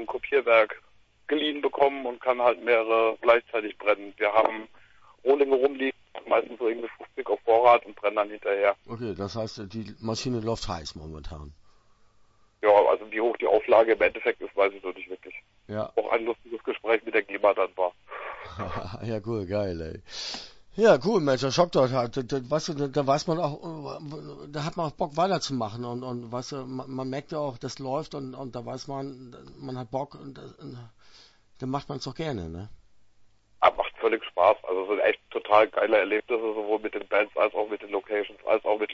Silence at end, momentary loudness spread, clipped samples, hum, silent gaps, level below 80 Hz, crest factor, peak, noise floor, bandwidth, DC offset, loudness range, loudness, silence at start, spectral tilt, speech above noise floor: 0 s; 17 LU; under 0.1%; none; none; -56 dBFS; 24 dB; -2 dBFS; -60 dBFS; 8 kHz; under 0.1%; 11 LU; -26 LUFS; 0 s; -5.5 dB/octave; 34 dB